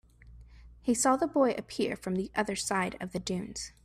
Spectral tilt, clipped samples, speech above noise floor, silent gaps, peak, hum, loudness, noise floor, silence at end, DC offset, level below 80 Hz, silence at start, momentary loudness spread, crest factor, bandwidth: -4 dB/octave; under 0.1%; 23 dB; none; -14 dBFS; none; -31 LUFS; -53 dBFS; 0.15 s; under 0.1%; -56 dBFS; 0.25 s; 10 LU; 18 dB; 15 kHz